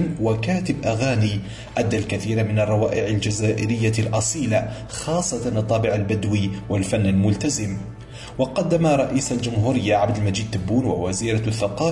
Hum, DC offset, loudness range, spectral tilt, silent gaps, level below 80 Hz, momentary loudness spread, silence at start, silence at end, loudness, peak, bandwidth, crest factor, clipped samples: none; under 0.1%; 1 LU; -5.5 dB/octave; none; -44 dBFS; 6 LU; 0 s; 0 s; -22 LUFS; -8 dBFS; 11.5 kHz; 14 dB; under 0.1%